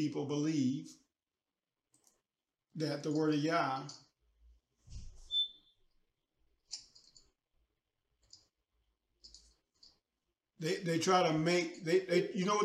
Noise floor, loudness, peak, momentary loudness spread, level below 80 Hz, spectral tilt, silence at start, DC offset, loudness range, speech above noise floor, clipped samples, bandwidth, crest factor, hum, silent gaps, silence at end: under -90 dBFS; -34 LUFS; -16 dBFS; 22 LU; -64 dBFS; -5 dB/octave; 0 s; under 0.1%; 21 LU; over 57 dB; under 0.1%; 14 kHz; 22 dB; none; none; 0 s